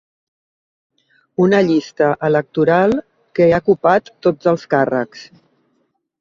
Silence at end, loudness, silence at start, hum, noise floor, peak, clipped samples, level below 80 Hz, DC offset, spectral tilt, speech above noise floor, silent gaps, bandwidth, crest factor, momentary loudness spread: 0.95 s; -16 LUFS; 1.4 s; none; -66 dBFS; -2 dBFS; under 0.1%; -54 dBFS; under 0.1%; -7.5 dB/octave; 51 dB; none; 7.4 kHz; 16 dB; 9 LU